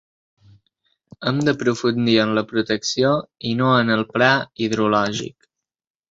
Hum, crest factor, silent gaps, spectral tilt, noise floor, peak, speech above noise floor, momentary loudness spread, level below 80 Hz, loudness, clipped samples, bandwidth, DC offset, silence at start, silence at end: none; 20 dB; none; -5 dB/octave; -69 dBFS; -2 dBFS; 50 dB; 7 LU; -58 dBFS; -19 LUFS; under 0.1%; 8 kHz; under 0.1%; 1.2 s; 0.8 s